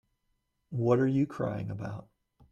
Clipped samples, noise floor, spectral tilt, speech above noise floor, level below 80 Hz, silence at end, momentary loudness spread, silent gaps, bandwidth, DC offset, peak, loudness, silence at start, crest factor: under 0.1%; -78 dBFS; -9.5 dB/octave; 49 dB; -64 dBFS; 0.5 s; 14 LU; none; 7.8 kHz; under 0.1%; -14 dBFS; -30 LUFS; 0.7 s; 18 dB